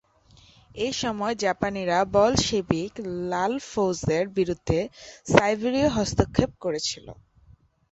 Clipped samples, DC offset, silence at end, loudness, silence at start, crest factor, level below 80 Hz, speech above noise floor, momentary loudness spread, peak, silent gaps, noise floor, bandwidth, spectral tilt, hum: under 0.1%; under 0.1%; 0.8 s; -25 LUFS; 0.75 s; 24 dB; -44 dBFS; 32 dB; 10 LU; -2 dBFS; none; -57 dBFS; 8.2 kHz; -5 dB/octave; none